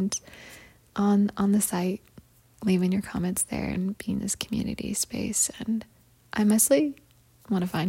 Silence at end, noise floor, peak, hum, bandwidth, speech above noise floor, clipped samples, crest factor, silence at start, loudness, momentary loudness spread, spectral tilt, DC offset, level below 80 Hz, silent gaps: 0 s; -54 dBFS; -8 dBFS; none; 16.5 kHz; 28 dB; under 0.1%; 18 dB; 0 s; -26 LUFS; 11 LU; -4.5 dB/octave; under 0.1%; -54 dBFS; none